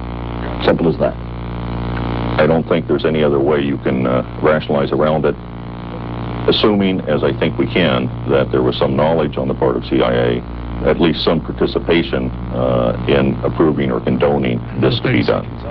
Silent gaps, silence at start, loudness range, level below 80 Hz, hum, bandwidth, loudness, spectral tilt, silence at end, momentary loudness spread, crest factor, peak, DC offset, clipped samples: none; 0 s; 1 LU; -30 dBFS; none; 5.8 kHz; -16 LUFS; -10 dB/octave; 0 s; 9 LU; 16 dB; 0 dBFS; 0.6%; under 0.1%